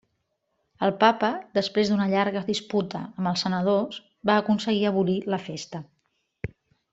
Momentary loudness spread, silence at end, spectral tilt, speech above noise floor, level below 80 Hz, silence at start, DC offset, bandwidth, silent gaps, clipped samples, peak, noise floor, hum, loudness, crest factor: 16 LU; 0.45 s; -5.5 dB/octave; 51 dB; -62 dBFS; 0.8 s; under 0.1%; 8 kHz; none; under 0.1%; -4 dBFS; -76 dBFS; none; -25 LUFS; 22 dB